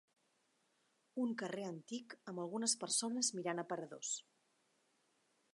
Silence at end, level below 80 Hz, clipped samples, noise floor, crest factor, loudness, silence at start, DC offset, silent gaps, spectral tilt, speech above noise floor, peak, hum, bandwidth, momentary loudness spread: 1.35 s; under -90 dBFS; under 0.1%; -80 dBFS; 22 dB; -41 LUFS; 1.15 s; under 0.1%; none; -2.5 dB/octave; 38 dB; -22 dBFS; none; 11.5 kHz; 12 LU